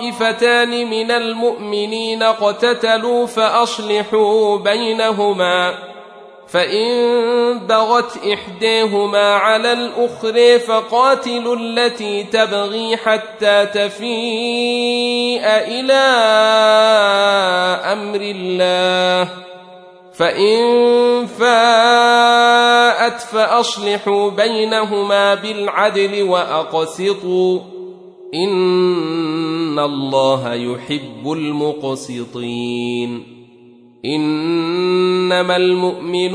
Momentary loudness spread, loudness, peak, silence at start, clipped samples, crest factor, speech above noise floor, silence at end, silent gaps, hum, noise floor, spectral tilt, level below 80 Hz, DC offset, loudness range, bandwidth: 10 LU; -15 LUFS; 0 dBFS; 0 s; under 0.1%; 14 dB; 29 dB; 0 s; none; none; -44 dBFS; -4 dB/octave; -66 dBFS; under 0.1%; 7 LU; 11 kHz